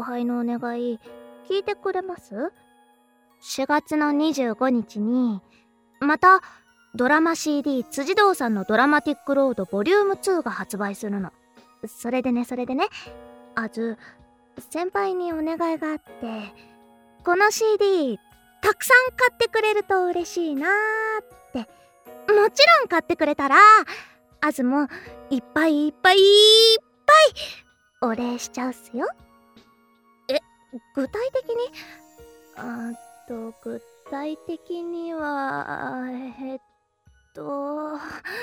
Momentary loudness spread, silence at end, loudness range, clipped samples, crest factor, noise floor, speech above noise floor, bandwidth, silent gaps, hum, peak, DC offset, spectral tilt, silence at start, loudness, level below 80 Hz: 20 LU; 0 s; 15 LU; under 0.1%; 18 dB; -60 dBFS; 38 dB; 19.5 kHz; none; none; -4 dBFS; under 0.1%; -3 dB/octave; 0 s; -21 LUFS; -62 dBFS